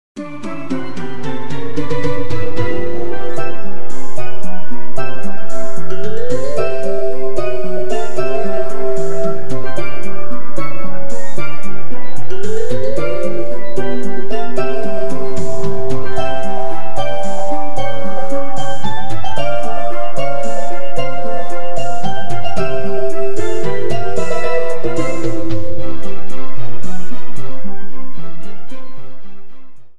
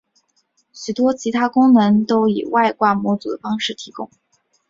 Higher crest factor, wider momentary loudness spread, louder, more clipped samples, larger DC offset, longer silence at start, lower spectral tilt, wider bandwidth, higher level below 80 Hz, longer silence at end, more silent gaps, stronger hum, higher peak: about the same, 12 dB vs 16 dB; second, 10 LU vs 18 LU; second, -23 LUFS vs -17 LUFS; neither; first, 70% vs under 0.1%; second, 0.15 s vs 0.75 s; about the same, -6.5 dB/octave vs -5.5 dB/octave; first, 12 kHz vs 7.6 kHz; first, -40 dBFS vs -62 dBFS; second, 0 s vs 0.65 s; neither; neither; about the same, 0 dBFS vs -2 dBFS